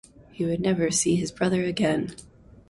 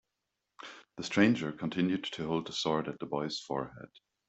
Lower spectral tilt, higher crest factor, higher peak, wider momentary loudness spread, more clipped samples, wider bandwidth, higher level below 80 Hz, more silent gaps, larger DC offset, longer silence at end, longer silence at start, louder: about the same, -4.5 dB/octave vs -5 dB/octave; second, 16 dB vs 24 dB; about the same, -10 dBFS vs -10 dBFS; second, 7 LU vs 21 LU; neither; first, 11.5 kHz vs 8.2 kHz; first, -54 dBFS vs -68 dBFS; neither; neither; about the same, 0.45 s vs 0.4 s; second, 0.35 s vs 0.6 s; first, -25 LUFS vs -33 LUFS